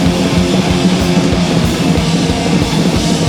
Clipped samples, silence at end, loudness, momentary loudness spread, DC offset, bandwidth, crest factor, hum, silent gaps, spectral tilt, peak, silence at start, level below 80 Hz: under 0.1%; 0 s; -12 LUFS; 1 LU; under 0.1%; 16.5 kHz; 12 dB; none; none; -5.5 dB/octave; 0 dBFS; 0 s; -26 dBFS